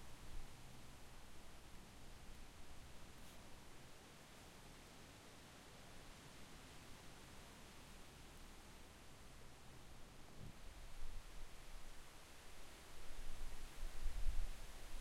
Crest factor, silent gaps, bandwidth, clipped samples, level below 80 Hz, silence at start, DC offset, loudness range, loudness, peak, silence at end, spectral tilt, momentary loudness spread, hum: 22 dB; none; 15 kHz; under 0.1%; -52 dBFS; 0 s; under 0.1%; 5 LU; -59 LUFS; -28 dBFS; 0 s; -3.5 dB/octave; 6 LU; none